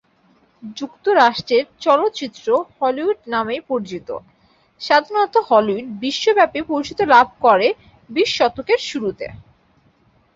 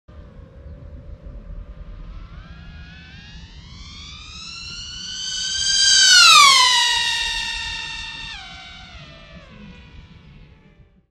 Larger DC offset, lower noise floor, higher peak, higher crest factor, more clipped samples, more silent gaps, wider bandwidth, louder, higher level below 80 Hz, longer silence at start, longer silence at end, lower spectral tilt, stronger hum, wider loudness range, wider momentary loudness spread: neither; first, -57 dBFS vs -51 dBFS; about the same, -2 dBFS vs 0 dBFS; about the same, 18 dB vs 22 dB; neither; neither; second, 7.8 kHz vs 15 kHz; second, -18 LUFS vs -13 LUFS; second, -56 dBFS vs -42 dBFS; first, 0.65 s vs 0.15 s; second, 1 s vs 1.3 s; first, -4 dB/octave vs 1.5 dB/octave; neither; second, 4 LU vs 22 LU; second, 16 LU vs 28 LU